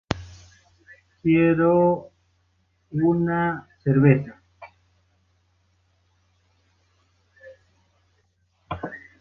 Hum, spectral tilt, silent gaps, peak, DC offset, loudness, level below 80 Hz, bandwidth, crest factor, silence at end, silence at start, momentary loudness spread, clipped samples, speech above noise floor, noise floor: none; -9 dB/octave; none; -4 dBFS; under 0.1%; -22 LUFS; -54 dBFS; 7 kHz; 22 dB; 0.2 s; 0.1 s; 18 LU; under 0.1%; 48 dB; -67 dBFS